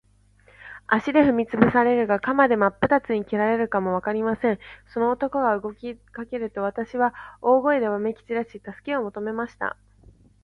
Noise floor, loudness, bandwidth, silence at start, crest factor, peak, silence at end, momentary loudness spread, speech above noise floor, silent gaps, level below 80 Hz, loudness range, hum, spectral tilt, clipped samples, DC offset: -57 dBFS; -23 LUFS; 6.4 kHz; 0.65 s; 22 dB; 0 dBFS; 0.7 s; 14 LU; 34 dB; none; -56 dBFS; 5 LU; none; -8 dB/octave; under 0.1%; under 0.1%